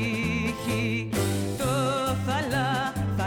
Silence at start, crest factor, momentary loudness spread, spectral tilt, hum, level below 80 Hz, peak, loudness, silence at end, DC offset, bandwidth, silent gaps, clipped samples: 0 s; 10 dB; 2 LU; -5.5 dB/octave; none; -46 dBFS; -16 dBFS; -27 LUFS; 0 s; under 0.1%; 19.5 kHz; none; under 0.1%